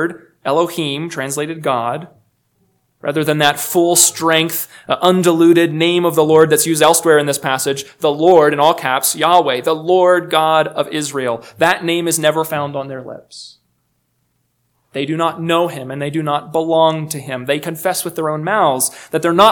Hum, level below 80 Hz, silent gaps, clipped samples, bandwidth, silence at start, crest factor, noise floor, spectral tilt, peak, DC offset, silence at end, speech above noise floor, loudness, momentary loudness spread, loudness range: none; -64 dBFS; none; 0.1%; 19.5 kHz; 0 s; 16 dB; -65 dBFS; -3.5 dB/octave; 0 dBFS; under 0.1%; 0 s; 51 dB; -15 LUFS; 12 LU; 9 LU